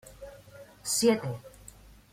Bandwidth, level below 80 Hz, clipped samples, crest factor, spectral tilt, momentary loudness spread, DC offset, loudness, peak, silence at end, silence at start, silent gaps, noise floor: 16.5 kHz; -58 dBFS; under 0.1%; 22 dB; -3.5 dB/octave; 26 LU; under 0.1%; -28 LUFS; -10 dBFS; 0.45 s; 0.05 s; none; -53 dBFS